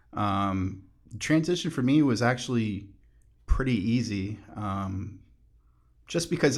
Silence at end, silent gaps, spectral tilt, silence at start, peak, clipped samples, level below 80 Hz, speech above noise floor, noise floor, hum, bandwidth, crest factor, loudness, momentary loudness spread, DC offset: 0 s; none; -5.5 dB/octave; 0.15 s; -10 dBFS; under 0.1%; -40 dBFS; 34 dB; -61 dBFS; none; 13 kHz; 18 dB; -28 LUFS; 13 LU; under 0.1%